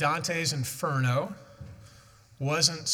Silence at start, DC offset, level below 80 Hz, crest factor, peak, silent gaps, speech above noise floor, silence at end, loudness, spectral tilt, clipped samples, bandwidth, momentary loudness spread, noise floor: 0 s; under 0.1%; -64 dBFS; 24 dB; -6 dBFS; none; 27 dB; 0 s; -28 LUFS; -3.5 dB/octave; under 0.1%; 17.5 kHz; 23 LU; -55 dBFS